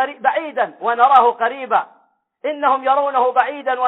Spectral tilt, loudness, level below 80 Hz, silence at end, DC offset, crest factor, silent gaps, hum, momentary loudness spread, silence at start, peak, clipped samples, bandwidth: -5 dB/octave; -17 LUFS; -70 dBFS; 0 s; under 0.1%; 16 dB; none; none; 10 LU; 0 s; 0 dBFS; under 0.1%; 4.1 kHz